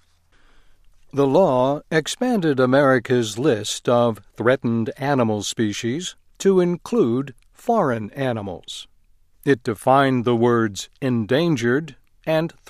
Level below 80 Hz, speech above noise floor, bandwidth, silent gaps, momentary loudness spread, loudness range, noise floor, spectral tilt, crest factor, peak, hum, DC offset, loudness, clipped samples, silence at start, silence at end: -56 dBFS; 35 dB; 15 kHz; none; 12 LU; 3 LU; -55 dBFS; -5.5 dB/octave; 18 dB; -2 dBFS; none; under 0.1%; -20 LUFS; under 0.1%; 1.15 s; 0.2 s